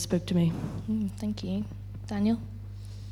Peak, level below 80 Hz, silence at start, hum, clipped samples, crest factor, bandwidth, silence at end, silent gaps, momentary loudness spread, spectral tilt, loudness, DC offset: -14 dBFS; -48 dBFS; 0 s; 50 Hz at -40 dBFS; under 0.1%; 16 dB; 14 kHz; 0 s; none; 15 LU; -6.5 dB/octave; -30 LUFS; under 0.1%